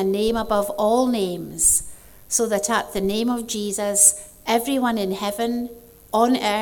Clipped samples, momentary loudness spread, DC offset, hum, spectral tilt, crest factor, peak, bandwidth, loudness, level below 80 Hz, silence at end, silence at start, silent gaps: under 0.1%; 10 LU; under 0.1%; none; -2.5 dB/octave; 20 dB; 0 dBFS; 20 kHz; -20 LUFS; -48 dBFS; 0 s; 0 s; none